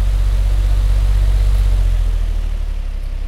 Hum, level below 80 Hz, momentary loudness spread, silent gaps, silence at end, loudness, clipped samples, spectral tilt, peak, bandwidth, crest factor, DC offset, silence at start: none; -14 dBFS; 8 LU; none; 0 s; -19 LUFS; under 0.1%; -6 dB/octave; -6 dBFS; 10.5 kHz; 8 dB; under 0.1%; 0 s